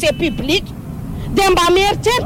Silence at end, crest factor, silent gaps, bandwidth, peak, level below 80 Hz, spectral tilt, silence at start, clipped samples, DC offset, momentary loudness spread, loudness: 0 s; 12 dB; none; 16.5 kHz; -4 dBFS; -30 dBFS; -4 dB/octave; 0 s; under 0.1%; under 0.1%; 16 LU; -15 LUFS